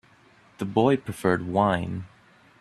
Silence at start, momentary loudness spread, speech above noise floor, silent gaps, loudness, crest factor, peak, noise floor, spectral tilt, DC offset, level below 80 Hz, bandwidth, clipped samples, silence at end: 0.6 s; 14 LU; 33 dB; none; -25 LUFS; 20 dB; -6 dBFS; -57 dBFS; -7 dB/octave; under 0.1%; -58 dBFS; 14 kHz; under 0.1%; 0.55 s